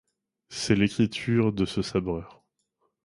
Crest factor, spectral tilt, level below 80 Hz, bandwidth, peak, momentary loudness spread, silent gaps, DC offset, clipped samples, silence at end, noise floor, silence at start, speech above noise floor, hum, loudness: 20 dB; -6 dB/octave; -50 dBFS; 11.5 kHz; -8 dBFS; 10 LU; none; under 0.1%; under 0.1%; 0.75 s; -75 dBFS; 0.5 s; 50 dB; none; -26 LUFS